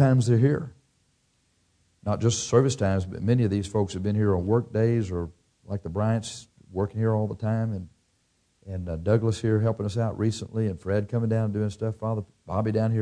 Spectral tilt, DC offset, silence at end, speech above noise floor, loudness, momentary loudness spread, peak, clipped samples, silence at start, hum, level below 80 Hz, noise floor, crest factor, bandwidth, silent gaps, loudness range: -7 dB/octave; under 0.1%; 0 s; 44 dB; -26 LUFS; 13 LU; -8 dBFS; under 0.1%; 0 s; none; -52 dBFS; -69 dBFS; 18 dB; 10 kHz; none; 5 LU